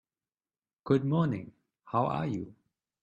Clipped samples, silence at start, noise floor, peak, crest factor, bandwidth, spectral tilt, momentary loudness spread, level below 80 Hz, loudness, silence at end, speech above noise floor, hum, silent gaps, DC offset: under 0.1%; 0.85 s; under -90 dBFS; -12 dBFS; 20 dB; 7.4 kHz; -9 dB/octave; 19 LU; -66 dBFS; -31 LUFS; 0.5 s; over 61 dB; none; none; under 0.1%